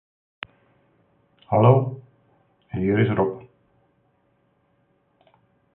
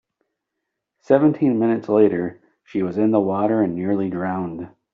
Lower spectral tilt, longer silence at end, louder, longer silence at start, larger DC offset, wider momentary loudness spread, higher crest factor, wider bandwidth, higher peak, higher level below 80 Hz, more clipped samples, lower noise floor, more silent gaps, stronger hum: first, -12.5 dB/octave vs -8.5 dB/octave; first, 2.35 s vs 0.25 s; about the same, -21 LUFS vs -20 LUFS; first, 1.5 s vs 1.1 s; neither; first, 23 LU vs 11 LU; first, 24 dB vs 18 dB; second, 3.8 kHz vs 5.2 kHz; about the same, -2 dBFS vs -2 dBFS; first, -54 dBFS vs -64 dBFS; neither; second, -66 dBFS vs -80 dBFS; neither; neither